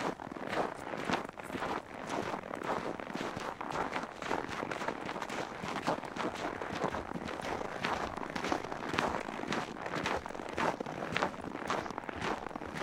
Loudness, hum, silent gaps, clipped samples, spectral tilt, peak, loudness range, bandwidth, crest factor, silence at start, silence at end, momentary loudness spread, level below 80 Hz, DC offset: -37 LUFS; none; none; under 0.1%; -4.5 dB/octave; -8 dBFS; 2 LU; 16.5 kHz; 28 dB; 0 s; 0 s; 5 LU; -60 dBFS; under 0.1%